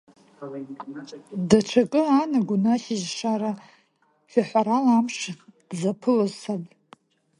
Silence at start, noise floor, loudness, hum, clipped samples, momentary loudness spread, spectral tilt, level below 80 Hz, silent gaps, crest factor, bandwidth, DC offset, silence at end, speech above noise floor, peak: 0.4 s; -65 dBFS; -23 LUFS; none; under 0.1%; 18 LU; -5.5 dB/octave; -64 dBFS; none; 24 dB; 11 kHz; under 0.1%; 0.75 s; 42 dB; -2 dBFS